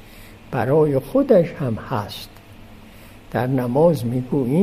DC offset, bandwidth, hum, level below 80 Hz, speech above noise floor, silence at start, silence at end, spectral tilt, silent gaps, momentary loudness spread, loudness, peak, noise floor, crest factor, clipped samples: under 0.1%; 15.5 kHz; none; -46 dBFS; 24 dB; 0.05 s; 0 s; -8 dB/octave; none; 12 LU; -20 LUFS; -4 dBFS; -42 dBFS; 16 dB; under 0.1%